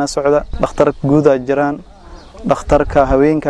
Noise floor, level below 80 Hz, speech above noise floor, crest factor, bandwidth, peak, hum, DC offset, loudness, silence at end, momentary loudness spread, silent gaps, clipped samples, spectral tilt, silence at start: -36 dBFS; -28 dBFS; 22 dB; 14 dB; 11 kHz; 0 dBFS; none; under 0.1%; -14 LUFS; 0 s; 8 LU; none; 0.2%; -6.5 dB/octave; 0 s